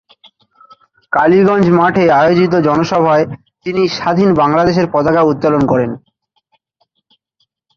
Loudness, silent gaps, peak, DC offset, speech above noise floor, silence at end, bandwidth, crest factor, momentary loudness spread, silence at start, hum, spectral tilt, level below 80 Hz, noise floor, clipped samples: -12 LUFS; none; 0 dBFS; under 0.1%; 54 dB; 1.8 s; 7 kHz; 12 dB; 8 LU; 1.1 s; none; -7.5 dB/octave; -46 dBFS; -65 dBFS; under 0.1%